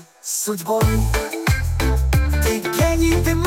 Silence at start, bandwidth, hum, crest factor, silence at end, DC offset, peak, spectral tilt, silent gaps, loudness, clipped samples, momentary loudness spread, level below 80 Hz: 0.25 s; 17 kHz; none; 14 dB; 0 s; under 0.1%; -6 dBFS; -5 dB/octave; none; -20 LUFS; under 0.1%; 5 LU; -24 dBFS